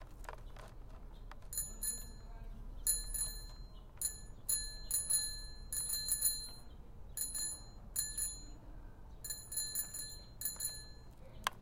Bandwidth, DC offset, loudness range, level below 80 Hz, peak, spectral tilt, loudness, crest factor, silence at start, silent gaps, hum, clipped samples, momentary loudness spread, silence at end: 16.5 kHz; under 0.1%; 5 LU; -52 dBFS; -12 dBFS; -0.5 dB/octave; -38 LUFS; 30 dB; 0 s; none; none; under 0.1%; 22 LU; 0 s